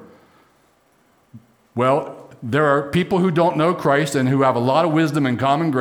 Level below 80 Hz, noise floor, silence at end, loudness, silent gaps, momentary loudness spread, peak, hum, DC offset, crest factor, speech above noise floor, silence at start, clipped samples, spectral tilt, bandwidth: -58 dBFS; -59 dBFS; 0 s; -18 LUFS; none; 6 LU; -4 dBFS; none; under 0.1%; 16 dB; 41 dB; 0 s; under 0.1%; -6.5 dB/octave; 19 kHz